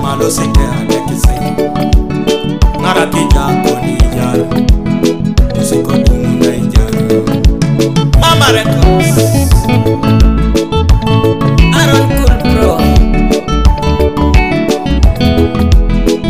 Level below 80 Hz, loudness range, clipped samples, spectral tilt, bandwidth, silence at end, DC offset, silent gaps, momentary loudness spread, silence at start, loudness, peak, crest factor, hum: -12 dBFS; 3 LU; 1%; -6 dB/octave; 16 kHz; 0 s; 3%; none; 4 LU; 0 s; -10 LUFS; 0 dBFS; 8 dB; none